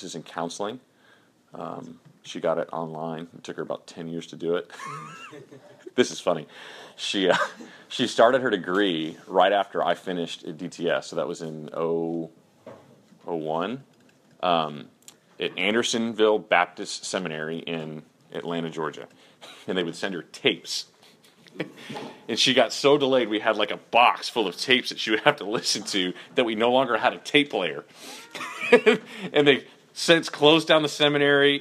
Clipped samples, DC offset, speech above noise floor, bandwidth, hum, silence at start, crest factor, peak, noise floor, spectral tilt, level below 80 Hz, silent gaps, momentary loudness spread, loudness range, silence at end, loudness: under 0.1%; under 0.1%; 34 dB; 14 kHz; none; 0 s; 26 dB; 0 dBFS; -59 dBFS; -3.5 dB/octave; -76 dBFS; none; 18 LU; 10 LU; 0 s; -24 LUFS